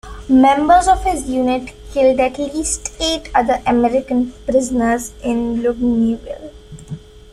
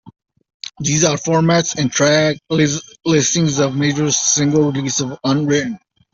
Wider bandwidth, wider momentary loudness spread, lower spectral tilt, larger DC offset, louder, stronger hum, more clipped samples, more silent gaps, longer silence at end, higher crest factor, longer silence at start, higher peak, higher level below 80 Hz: first, 13.5 kHz vs 8 kHz; first, 15 LU vs 8 LU; about the same, -4 dB/octave vs -4 dB/octave; neither; about the same, -16 LUFS vs -16 LUFS; neither; neither; second, none vs 0.54-0.60 s; second, 0.15 s vs 0.35 s; about the same, 14 dB vs 14 dB; about the same, 0.05 s vs 0.05 s; about the same, -2 dBFS vs -2 dBFS; first, -36 dBFS vs -52 dBFS